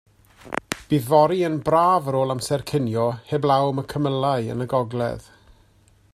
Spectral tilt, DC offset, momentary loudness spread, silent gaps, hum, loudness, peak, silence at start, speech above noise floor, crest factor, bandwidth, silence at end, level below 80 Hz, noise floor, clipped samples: -6.5 dB/octave; under 0.1%; 11 LU; none; none; -22 LUFS; -2 dBFS; 0.45 s; 36 dB; 22 dB; 15 kHz; 0.95 s; -54 dBFS; -57 dBFS; under 0.1%